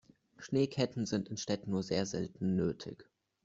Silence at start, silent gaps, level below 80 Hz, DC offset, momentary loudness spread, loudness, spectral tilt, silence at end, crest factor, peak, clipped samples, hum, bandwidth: 0.4 s; none; -68 dBFS; under 0.1%; 12 LU; -35 LUFS; -6 dB/octave; 0.45 s; 20 dB; -16 dBFS; under 0.1%; none; 8 kHz